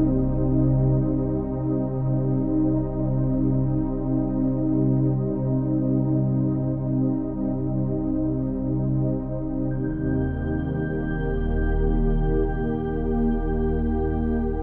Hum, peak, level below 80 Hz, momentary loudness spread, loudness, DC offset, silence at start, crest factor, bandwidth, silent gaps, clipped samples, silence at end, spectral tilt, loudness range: none; -10 dBFS; -30 dBFS; 5 LU; -24 LUFS; under 0.1%; 0 s; 12 dB; 3.3 kHz; none; under 0.1%; 0 s; -13.5 dB/octave; 3 LU